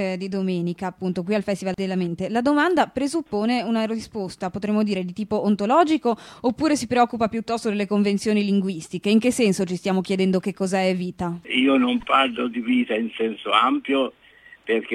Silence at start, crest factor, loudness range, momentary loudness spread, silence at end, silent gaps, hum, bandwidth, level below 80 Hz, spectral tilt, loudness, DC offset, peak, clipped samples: 0 s; 18 dB; 2 LU; 8 LU; 0 s; none; none; 13.5 kHz; -58 dBFS; -5.5 dB/octave; -22 LUFS; under 0.1%; -4 dBFS; under 0.1%